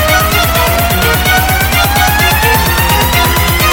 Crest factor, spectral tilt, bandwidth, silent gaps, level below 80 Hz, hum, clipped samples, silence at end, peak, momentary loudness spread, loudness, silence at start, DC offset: 10 dB; -3.5 dB/octave; 17.5 kHz; none; -18 dBFS; none; under 0.1%; 0 s; 0 dBFS; 1 LU; -9 LUFS; 0 s; under 0.1%